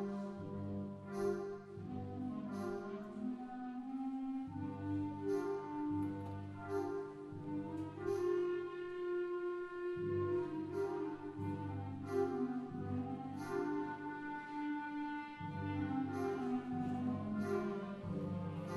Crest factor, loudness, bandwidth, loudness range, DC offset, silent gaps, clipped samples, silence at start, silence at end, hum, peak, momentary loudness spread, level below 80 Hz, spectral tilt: 16 dB; -42 LUFS; 12.5 kHz; 3 LU; under 0.1%; none; under 0.1%; 0 s; 0 s; none; -26 dBFS; 7 LU; -72 dBFS; -8 dB/octave